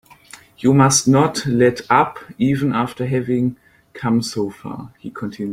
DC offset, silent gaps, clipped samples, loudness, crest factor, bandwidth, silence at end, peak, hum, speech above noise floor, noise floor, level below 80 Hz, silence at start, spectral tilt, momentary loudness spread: under 0.1%; none; under 0.1%; -18 LUFS; 16 dB; 16 kHz; 0 s; -2 dBFS; none; 27 dB; -44 dBFS; -52 dBFS; 0.6 s; -5 dB/octave; 16 LU